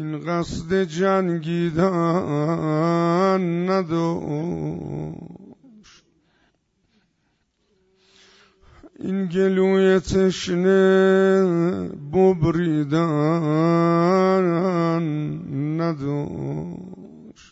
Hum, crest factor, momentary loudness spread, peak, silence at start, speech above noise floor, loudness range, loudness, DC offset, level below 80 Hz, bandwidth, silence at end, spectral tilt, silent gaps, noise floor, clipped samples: none; 16 dB; 12 LU; -6 dBFS; 0 s; 49 dB; 11 LU; -21 LUFS; under 0.1%; -50 dBFS; 8 kHz; 0.2 s; -7.5 dB/octave; none; -69 dBFS; under 0.1%